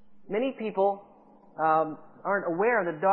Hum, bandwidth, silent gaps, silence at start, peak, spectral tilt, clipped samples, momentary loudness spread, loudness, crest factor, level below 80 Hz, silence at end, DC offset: none; 4.2 kHz; none; 0.05 s; -10 dBFS; -10 dB/octave; under 0.1%; 10 LU; -28 LUFS; 18 dB; -76 dBFS; 0 s; under 0.1%